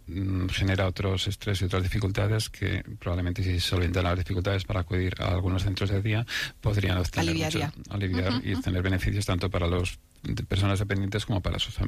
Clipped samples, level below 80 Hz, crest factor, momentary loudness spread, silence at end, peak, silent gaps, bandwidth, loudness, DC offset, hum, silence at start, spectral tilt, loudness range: under 0.1%; -42 dBFS; 12 dB; 4 LU; 0 s; -14 dBFS; none; 14.5 kHz; -28 LUFS; under 0.1%; none; 0.05 s; -5.5 dB/octave; 1 LU